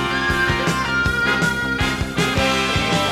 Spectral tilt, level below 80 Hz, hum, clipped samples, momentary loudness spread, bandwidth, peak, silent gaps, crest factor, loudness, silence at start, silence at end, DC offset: -4 dB/octave; -34 dBFS; none; under 0.1%; 3 LU; 18 kHz; -6 dBFS; none; 14 dB; -19 LUFS; 0 s; 0 s; under 0.1%